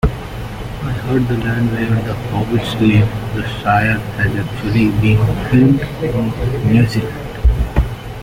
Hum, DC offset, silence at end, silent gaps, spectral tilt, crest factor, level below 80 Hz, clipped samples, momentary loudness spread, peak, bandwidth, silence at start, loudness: none; under 0.1%; 0 s; none; -7.5 dB/octave; 14 dB; -24 dBFS; under 0.1%; 10 LU; -2 dBFS; 16 kHz; 0.05 s; -16 LUFS